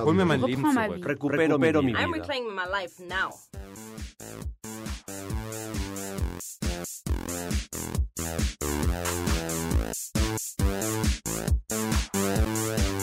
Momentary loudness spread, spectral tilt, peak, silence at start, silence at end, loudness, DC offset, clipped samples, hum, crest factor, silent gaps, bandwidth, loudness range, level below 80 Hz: 14 LU; -4.5 dB/octave; -12 dBFS; 0 s; 0 s; -28 LUFS; under 0.1%; under 0.1%; none; 16 dB; none; 16 kHz; 8 LU; -34 dBFS